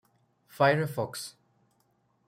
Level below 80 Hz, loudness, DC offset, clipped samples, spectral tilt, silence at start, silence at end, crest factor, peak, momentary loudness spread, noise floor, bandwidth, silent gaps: -74 dBFS; -28 LUFS; under 0.1%; under 0.1%; -5.5 dB/octave; 0.55 s; 0.95 s; 22 dB; -10 dBFS; 16 LU; -71 dBFS; 16 kHz; none